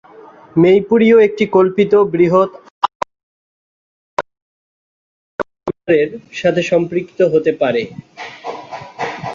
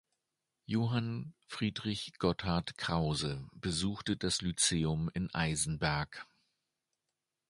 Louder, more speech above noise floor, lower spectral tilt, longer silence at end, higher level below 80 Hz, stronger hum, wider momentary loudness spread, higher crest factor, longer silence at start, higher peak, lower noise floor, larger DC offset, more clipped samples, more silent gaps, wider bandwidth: first, -15 LUFS vs -34 LUFS; second, 27 dB vs 54 dB; first, -7 dB/octave vs -4 dB/octave; second, 0 s vs 1.3 s; about the same, -56 dBFS vs -54 dBFS; neither; first, 18 LU vs 9 LU; second, 14 dB vs 22 dB; second, 0.55 s vs 0.7 s; first, -2 dBFS vs -14 dBFS; second, -40 dBFS vs -88 dBFS; neither; neither; first, 2.70-2.81 s, 2.95-3.00 s, 3.23-4.17 s, 4.42-5.39 s vs none; second, 7.4 kHz vs 11.5 kHz